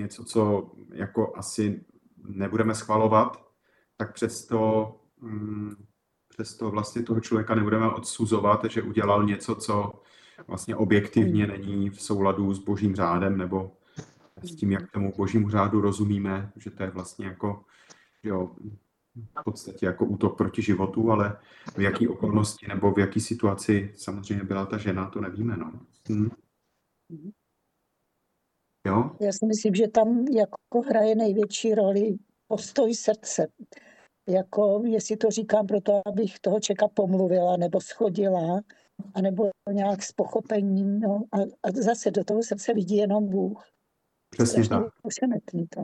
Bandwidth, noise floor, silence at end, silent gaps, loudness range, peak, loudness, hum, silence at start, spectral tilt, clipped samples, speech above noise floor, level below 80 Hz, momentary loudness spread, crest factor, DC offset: 12 kHz; -76 dBFS; 0 s; none; 7 LU; -6 dBFS; -26 LUFS; none; 0 s; -6 dB/octave; under 0.1%; 51 dB; -62 dBFS; 13 LU; 20 dB; under 0.1%